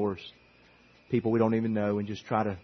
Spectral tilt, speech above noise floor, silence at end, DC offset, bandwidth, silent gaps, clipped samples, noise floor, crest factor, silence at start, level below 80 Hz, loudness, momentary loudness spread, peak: -8.5 dB/octave; 31 dB; 0.05 s; under 0.1%; 6.4 kHz; none; under 0.1%; -59 dBFS; 18 dB; 0 s; -68 dBFS; -29 LUFS; 10 LU; -12 dBFS